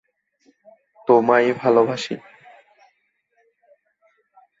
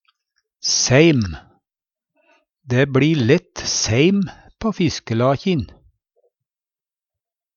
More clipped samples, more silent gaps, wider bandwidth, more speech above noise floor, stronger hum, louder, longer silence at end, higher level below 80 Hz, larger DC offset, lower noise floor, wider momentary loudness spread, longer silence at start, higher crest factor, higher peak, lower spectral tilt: neither; neither; about the same, 7.8 kHz vs 7.4 kHz; second, 51 dB vs over 73 dB; neither; about the same, -18 LUFS vs -18 LUFS; first, 2.4 s vs 1.9 s; second, -72 dBFS vs -46 dBFS; neither; second, -68 dBFS vs under -90 dBFS; first, 16 LU vs 12 LU; first, 1.1 s vs 0.65 s; about the same, 22 dB vs 20 dB; about the same, -2 dBFS vs 0 dBFS; about the same, -5.5 dB/octave vs -4.5 dB/octave